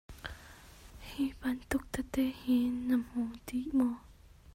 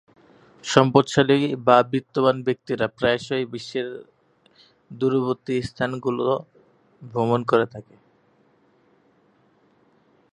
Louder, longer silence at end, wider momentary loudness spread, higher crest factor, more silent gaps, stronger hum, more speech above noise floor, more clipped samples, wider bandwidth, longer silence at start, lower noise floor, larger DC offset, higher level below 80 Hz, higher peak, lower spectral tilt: second, -34 LUFS vs -22 LUFS; second, 0.05 s vs 2.5 s; first, 20 LU vs 12 LU; second, 16 dB vs 24 dB; neither; neither; second, 21 dB vs 39 dB; neither; first, 16 kHz vs 10.5 kHz; second, 0.1 s vs 0.65 s; second, -54 dBFS vs -61 dBFS; neither; first, -54 dBFS vs -60 dBFS; second, -18 dBFS vs 0 dBFS; about the same, -5 dB/octave vs -6 dB/octave